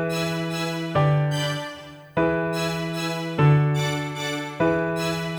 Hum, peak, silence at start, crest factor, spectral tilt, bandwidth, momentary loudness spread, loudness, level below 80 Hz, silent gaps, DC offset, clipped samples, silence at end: none; -6 dBFS; 0 s; 18 dB; -6 dB/octave; 19.5 kHz; 8 LU; -24 LUFS; -52 dBFS; none; under 0.1%; under 0.1%; 0 s